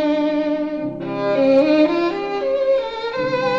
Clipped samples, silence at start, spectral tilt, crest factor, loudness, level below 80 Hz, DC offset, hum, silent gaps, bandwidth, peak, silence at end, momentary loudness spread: under 0.1%; 0 s; -6.5 dB/octave; 14 dB; -19 LUFS; -54 dBFS; 0.2%; none; none; 7.4 kHz; -4 dBFS; 0 s; 10 LU